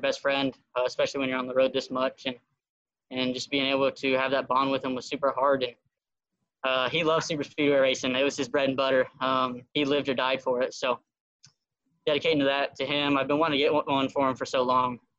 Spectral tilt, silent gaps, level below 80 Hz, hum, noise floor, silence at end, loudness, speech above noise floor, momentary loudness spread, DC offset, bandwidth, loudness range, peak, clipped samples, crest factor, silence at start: -4 dB/octave; 2.69-2.85 s, 11.20-11.39 s; -68 dBFS; none; -87 dBFS; 0.2 s; -27 LUFS; 61 dB; 6 LU; under 0.1%; 8.2 kHz; 3 LU; -10 dBFS; under 0.1%; 16 dB; 0 s